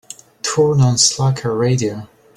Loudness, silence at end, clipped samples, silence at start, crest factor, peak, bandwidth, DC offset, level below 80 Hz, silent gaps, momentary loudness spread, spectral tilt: -16 LUFS; 0.3 s; under 0.1%; 0.45 s; 16 dB; 0 dBFS; 12.5 kHz; under 0.1%; -50 dBFS; none; 12 LU; -4.5 dB/octave